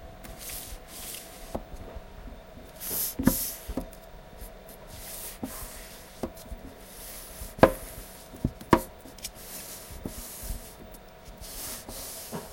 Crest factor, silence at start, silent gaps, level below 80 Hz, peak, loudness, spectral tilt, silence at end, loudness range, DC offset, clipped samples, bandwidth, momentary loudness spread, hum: 34 dB; 0 s; none; -46 dBFS; 0 dBFS; -32 LUFS; -4.5 dB/octave; 0 s; 11 LU; under 0.1%; under 0.1%; 17 kHz; 20 LU; none